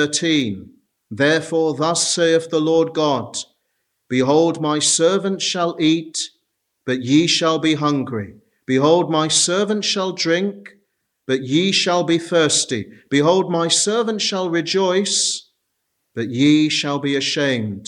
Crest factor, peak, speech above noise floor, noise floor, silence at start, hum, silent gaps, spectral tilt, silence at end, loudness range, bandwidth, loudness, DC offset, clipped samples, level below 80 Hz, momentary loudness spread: 16 dB; -2 dBFS; 55 dB; -73 dBFS; 0 s; none; none; -3.5 dB/octave; 0 s; 2 LU; 12 kHz; -18 LUFS; under 0.1%; under 0.1%; -66 dBFS; 11 LU